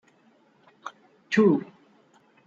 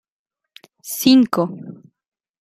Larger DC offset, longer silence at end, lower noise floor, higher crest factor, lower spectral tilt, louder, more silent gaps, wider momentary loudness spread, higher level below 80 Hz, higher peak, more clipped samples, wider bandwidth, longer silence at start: neither; about the same, 0.8 s vs 0.7 s; first, -62 dBFS vs -50 dBFS; about the same, 20 dB vs 18 dB; first, -7 dB/octave vs -4.5 dB/octave; second, -23 LUFS vs -17 LUFS; neither; about the same, 22 LU vs 24 LU; second, -76 dBFS vs -62 dBFS; second, -8 dBFS vs -2 dBFS; neither; second, 7.6 kHz vs 15.5 kHz; about the same, 0.85 s vs 0.85 s